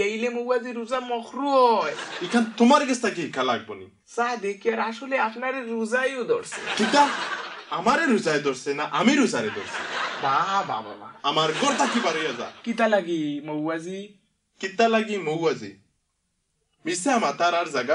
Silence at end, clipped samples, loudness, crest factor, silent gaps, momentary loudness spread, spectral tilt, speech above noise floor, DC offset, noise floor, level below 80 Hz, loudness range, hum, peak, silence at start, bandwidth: 0 s; under 0.1%; -24 LUFS; 20 dB; none; 11 LU; -3.5 dB/octave; 50 dB; under 0.1%; -74 dBFS; -72 dBFS; 4 LU; none; -6 dBFS; 0 s; 11 kHz